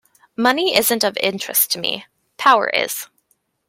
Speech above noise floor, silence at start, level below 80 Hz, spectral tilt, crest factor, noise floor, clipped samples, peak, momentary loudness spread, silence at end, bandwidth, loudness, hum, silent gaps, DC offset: 47 dB; 0.4 s; -66 dBFS; -1.5 dB/octave; 20 dB; -65 dBFS; under 0.1%; 0 dBFS; 13 LU; 0.65 s; 16.5 kHz; -17 LUFS; none; none; under 0.1%